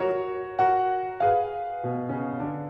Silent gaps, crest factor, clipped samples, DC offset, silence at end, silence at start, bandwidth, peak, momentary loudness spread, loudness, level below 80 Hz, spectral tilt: none; 14 dB; under 0.1%; under 0.1%; 0 s; 0 s; 5.8 kHz; -12 dBFS; 8 LU; -26 LUFS; -60 dBFS; -9 dB/octave